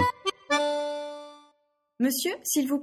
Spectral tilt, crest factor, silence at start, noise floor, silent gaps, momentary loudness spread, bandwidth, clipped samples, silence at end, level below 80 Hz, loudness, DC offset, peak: -3 dB/octave; 18 dB; 0 s; -71 dBFS; none; 14 LU; 16.5 kHz; under 0.1%; 0 s; -68 dBFS; -28 LUFS; under 0.1%; -12 dBFS